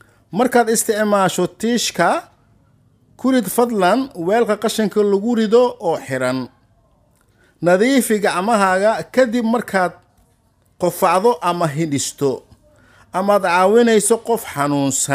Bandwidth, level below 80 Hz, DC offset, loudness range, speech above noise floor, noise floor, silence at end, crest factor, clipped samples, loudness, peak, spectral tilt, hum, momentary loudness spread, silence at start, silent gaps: 16 kHz; -58 dBFS; under 0.1%; 2 LU; 42 dB; -58 dBFS; 0 s; 16 dB; under 0.1%; -17 LUFS; -2 dBFS; -4 dB/octave; none; 8 LU; 0.3 s; none